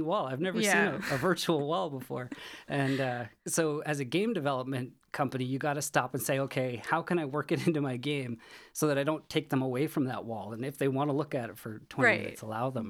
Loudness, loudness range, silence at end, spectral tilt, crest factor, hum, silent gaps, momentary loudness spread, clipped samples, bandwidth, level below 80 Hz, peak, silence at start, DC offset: -31 LUFS; 2 LU; 0 s; -5 dB/octave; 22 dB; none; none; 11 LU; under 0.1%; 19 kHz; -70 dBFS; -10 dBFS; 0 s; under 0.1%